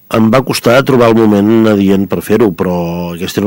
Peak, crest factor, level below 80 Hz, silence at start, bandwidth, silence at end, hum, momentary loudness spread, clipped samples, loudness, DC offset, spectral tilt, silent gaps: 0 dBFS; 10 dB; -42 dBFS; 0.1 s; 16.5 kHz; 0 s; none; 8 LU; under 0.1%; -10 LUFS; under 0.1%; -6.5 dB/octave; none